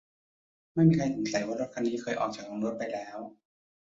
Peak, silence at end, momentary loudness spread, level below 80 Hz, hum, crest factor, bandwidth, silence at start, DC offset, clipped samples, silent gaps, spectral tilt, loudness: -12 dBFS; 0.55 s; 15 LU; -64 dBFS; none; 20 dB; 7.8 kHz; 0.75 s; under 0.1%; under 0.1%; none; -6.5 dB/octave; -30 LUFS